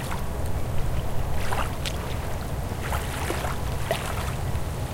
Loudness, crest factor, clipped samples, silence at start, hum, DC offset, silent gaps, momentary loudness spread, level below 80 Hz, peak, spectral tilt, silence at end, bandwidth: -30 LUFS; 16 dB; under 0.1%; 0 s; none; under 0.1%; none; 3 LU; -32 dBFS; -10 dBFS; -5 dB/octave; 0 s; 17 kHz